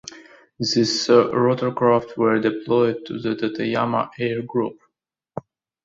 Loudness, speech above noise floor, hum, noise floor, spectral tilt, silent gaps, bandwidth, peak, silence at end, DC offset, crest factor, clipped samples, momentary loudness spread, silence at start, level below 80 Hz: -21 LUFS; 58 dB; none; -78 dBFS; -5 dB/octave; none; 7.8 kHz; -2 dBFS; 0.45 s; under 0.1%; 20 dB; under 0.1%; 15 LU; 0.05 s; -62 dBFS